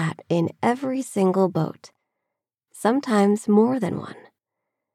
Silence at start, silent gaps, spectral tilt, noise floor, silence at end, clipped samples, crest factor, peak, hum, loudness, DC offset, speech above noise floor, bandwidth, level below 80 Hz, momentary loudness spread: 0 s; none; -7 dB/octave; -84 dBFS; 0.8 s; under 0.1%; 16 dB; -6 dBFS; none; -22 LUFS; under 0.1%; 62 dB; 14 kHz; -80 dBFS; 9 LU